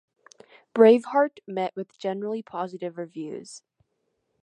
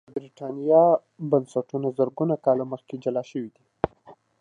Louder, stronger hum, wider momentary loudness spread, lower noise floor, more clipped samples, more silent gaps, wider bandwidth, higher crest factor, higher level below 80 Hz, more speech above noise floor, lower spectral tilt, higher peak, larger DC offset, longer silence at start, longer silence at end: about the same, -24 LUFS vs -25 LUFS; neither; first, 19 LU vs 16 LU; first, -76 dBFS vs -53 dBFS; neither; neither; about the same, 9.4 kHz vs 9.8 kHz; about the same, 22 dB vs 20 dB; second, -82 dBFS vs -60 dBFS; first, 52 dB vs 29 dB; second, -6 dB/octave vs -9 dB/octave; about the same, -4 dBFS vs -4 dBFS; neither; first, 0.75 s vs 0.15 s; first, 0.85 s vs 0.3 s